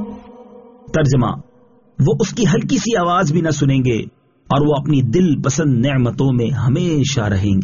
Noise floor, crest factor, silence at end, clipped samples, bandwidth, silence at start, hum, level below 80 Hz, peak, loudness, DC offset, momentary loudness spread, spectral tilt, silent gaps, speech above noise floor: -51 dBFS; 12 dB; 0 s; under 0.1%; 7.4 kHz; 0 s; none; -40 dBFS; -4 dBFS; -16 LUFS; 0.3%; 6 LU; -7 dB/octave; none; 36 dB